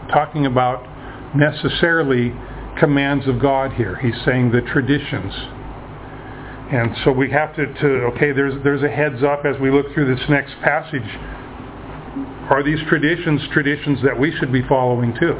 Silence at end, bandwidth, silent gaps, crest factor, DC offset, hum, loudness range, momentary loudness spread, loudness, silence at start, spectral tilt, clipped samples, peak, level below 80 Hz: 0 s; 4 kHz; none; 18 dB; under 0.1%; none; 3 LU; 17 LU; -18 LUFS; 0 s; -10.5 dB/octave; under 0.1%; 0 dBFS; -40 dBFS